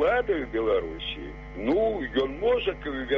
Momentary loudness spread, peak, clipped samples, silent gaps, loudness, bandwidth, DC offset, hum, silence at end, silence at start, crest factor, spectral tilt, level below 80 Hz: 9 LU; -12 dBFS; under 0.1%; none; -27 LUFS; 6.4 kHz; under 0.1%; none; 0 s; 0 s; 14 dB; -3 dB/octave; -42 dBFS